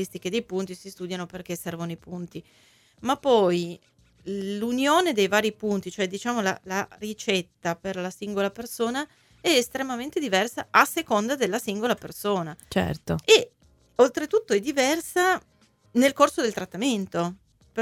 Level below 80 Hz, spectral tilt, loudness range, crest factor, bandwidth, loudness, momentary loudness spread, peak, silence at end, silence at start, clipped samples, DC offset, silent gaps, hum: -58 dBFS; -4 dB/octave; 5 LU; 24 dB; 17.5 kHz; -25 LUFS; 14 LU; -2 dBFS; 0 s; 0 s; under 0.1%; under 0.1%; none; none